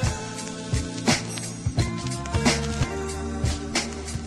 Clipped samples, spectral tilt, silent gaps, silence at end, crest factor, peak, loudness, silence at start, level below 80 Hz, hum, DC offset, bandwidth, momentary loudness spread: under 0.1%; -4 dB/octave; none; 0 s; 20 dB; -8 dBFS; -27 LUFS; 0 s; -36 dBFS; none; under 0.1%; 13 kHz; 8 LU